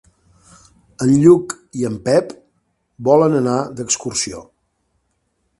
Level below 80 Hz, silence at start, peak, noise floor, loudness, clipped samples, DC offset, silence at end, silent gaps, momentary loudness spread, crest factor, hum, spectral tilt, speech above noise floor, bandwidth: -54 dBFS; 1 s; 0 dBFS; -68 dBFS; -16 LUFS; under 0.1%; under 0.1%; 1.2 s; none; 13 LU; 18 dB; none; -5.5 dB/octave; 52 dB; 11.5 kHz